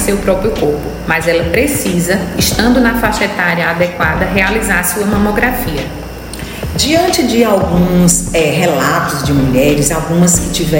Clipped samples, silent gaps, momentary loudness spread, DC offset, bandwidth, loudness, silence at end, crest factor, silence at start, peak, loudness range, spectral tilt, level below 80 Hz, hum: under 0.1%; none; 7 LU; under 0.1%; 16.5 kHz; -12 LUFS; 0 s; 12 dB; 0 s; 0 dBFS; 2 LU; -4.5 dB/octave; -26 dBFS; none